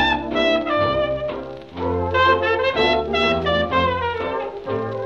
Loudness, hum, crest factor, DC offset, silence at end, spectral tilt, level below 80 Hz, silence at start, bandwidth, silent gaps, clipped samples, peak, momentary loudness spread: -20 LUFS; none; 14 dB; 0.2%; 0 s; -6 dB/octave; -40 dBFS; 0 s; 7.8 kHz; none; under 0.1%; -6 dBFS; 10 LU